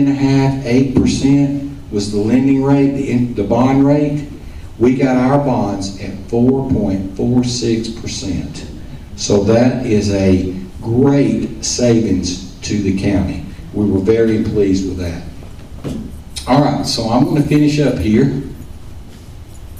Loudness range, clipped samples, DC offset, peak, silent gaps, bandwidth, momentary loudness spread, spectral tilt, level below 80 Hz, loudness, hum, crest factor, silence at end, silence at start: 3 LU; under 0.1%; 0.4%; -2 dBFS; none; 13 kHz; 15 LU; -6.5 dB/octave; -34 dBFS; -15 LUFS; none; 12 dB; 0 s; 0 s